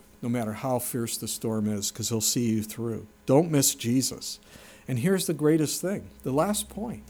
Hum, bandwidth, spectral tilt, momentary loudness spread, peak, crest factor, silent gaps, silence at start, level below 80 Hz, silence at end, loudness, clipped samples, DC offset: none; over 20 kHz; -4.5 dB/octave; 11 LU; -8 dBFS; 18 dB; none; 0.2 s; -58 dBFS; 0 s; -27 LUFS; under 0.1%; under 0.1%